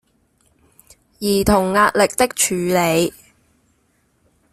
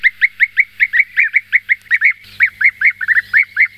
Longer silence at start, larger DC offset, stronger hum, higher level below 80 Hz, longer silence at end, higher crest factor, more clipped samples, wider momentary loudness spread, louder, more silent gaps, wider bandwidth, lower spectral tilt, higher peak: first, 1.2 s vs 0.05 s; neither; second, none vs 50 Hz at -55 dBFS; first, -42 dBFS vs -58 dBFS; first, 1.4 s vs 0.1 s; first, 18 dB vs 12 dB; neither; first, 6 LU vs 3 LU; second, -17 LUFS vs -12 LUFS; neither; about the same, 16 kHz vs 15.5 kHz; first, -4 dB/octave vs 0 dB/octave; about the same, -2 dBFS vs -2 dBFS